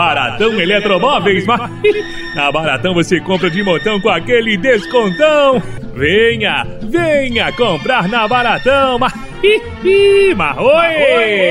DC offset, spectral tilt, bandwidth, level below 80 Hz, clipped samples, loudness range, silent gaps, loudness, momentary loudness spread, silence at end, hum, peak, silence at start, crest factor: under 0.1%; -5 dB/octave; 12 kHz; -34 dBFS; under 0.1%; 2 LU; none; -12 LUFS; 6 LU; 0 s; none; 0 dBFS; 0 s; 12 dB